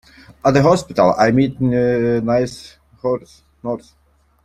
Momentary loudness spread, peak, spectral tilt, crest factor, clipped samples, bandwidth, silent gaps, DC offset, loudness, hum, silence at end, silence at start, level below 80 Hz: 13 LU; -2 dBFS; -7 dB/octave; 16 dB; under 0.1%; 12.5 kHz; none; under 0.1%; -17 LUFS; none; 0.65 s; 0.45 s; -46 dBFS